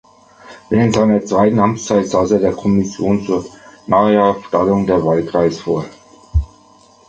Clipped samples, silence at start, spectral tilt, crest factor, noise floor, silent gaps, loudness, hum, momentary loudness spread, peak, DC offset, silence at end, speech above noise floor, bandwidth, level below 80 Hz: under 0.1%; 0.45 s; -7 dB/octave; 14 dB; -47 dBFS; none; -15 LUFS; none; 9 LU; -2 dBFS; under 0.1%; 0.65 s; 33 dB; 8.6 kHz; -32 dBFS